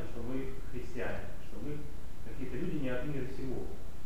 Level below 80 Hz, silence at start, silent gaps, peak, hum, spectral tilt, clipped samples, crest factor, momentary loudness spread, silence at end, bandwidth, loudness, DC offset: -46 dBFS; 0 s; none; -20 dBFS; none; -7 dB/octave; under 0.1%; 16 dB; 10 LU; 0 s; 15 kHz; -41 LUFS; 3%